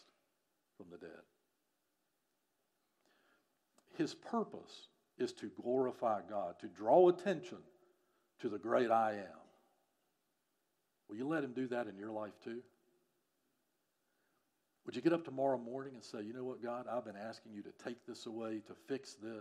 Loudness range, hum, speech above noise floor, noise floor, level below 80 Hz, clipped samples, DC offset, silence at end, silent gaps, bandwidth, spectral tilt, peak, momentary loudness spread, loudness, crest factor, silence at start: 11 LU; none; 46 dB; -84 dBFS; under -90 dBFS; under 0.1%; under 0.1%; 0 s; none; 11 kHz; -6 dB/octave; -16 dBFS; 20 LU; -39 LUFS; 24 dB; 0.8 s